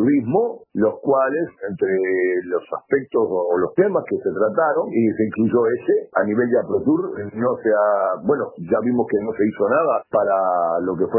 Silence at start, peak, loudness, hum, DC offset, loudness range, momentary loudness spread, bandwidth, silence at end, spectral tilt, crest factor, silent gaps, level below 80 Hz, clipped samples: 0 s; -4 dBFS; -20 LUFS; none; under 0.1%; 1 LU; 5 LU; 3.1 kHz; 0 s; -12.5 dB/octave; 16 dB; none; -62 dBFS; under 0.1%